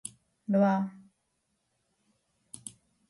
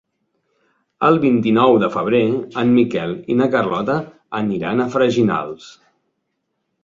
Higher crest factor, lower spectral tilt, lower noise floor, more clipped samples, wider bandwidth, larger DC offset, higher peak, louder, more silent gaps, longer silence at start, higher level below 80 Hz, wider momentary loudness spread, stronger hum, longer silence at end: about the same, 18 dB vs 16 dB; about the same, -7 dB/octave vs -7.5 dB/octave; first, -78 dBFS vs -73 dBFS; neither; first, 11.5 kHz vs 7.4 kHz; neither; second, -16 dBFS vs -2 dBFS; second, -28 LUFS vs -17 LUFS; neither; second, 0.05 s vs 1 s; second, -78 dBFS vs -58 dBFS; first, 21 LU vs 10 LU; neither; second, 0.4 s vs 1.15 s